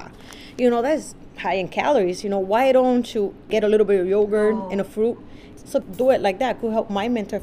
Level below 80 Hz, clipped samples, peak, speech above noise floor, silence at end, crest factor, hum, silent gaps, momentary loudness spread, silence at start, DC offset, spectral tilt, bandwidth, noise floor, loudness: -50 dBFS; under 0.1%; -6 dBFS; 21 dB; 0 s; 16 dB; none; none; 9 LU; 0 s; under 0.1%; -5.5 dB/octave; 15.5 kHz; -41 dBFS; -21 LUFS